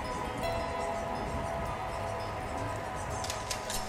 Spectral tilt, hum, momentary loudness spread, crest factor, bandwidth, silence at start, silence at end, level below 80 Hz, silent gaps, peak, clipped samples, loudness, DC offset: -4 dB/octave; none; 3 LU; 14 dB; 16 kHz; 0 s; 0 s; -46 dBFS; none; -20 dBFS; under 0.1%; -35 LUFS; under 0.1%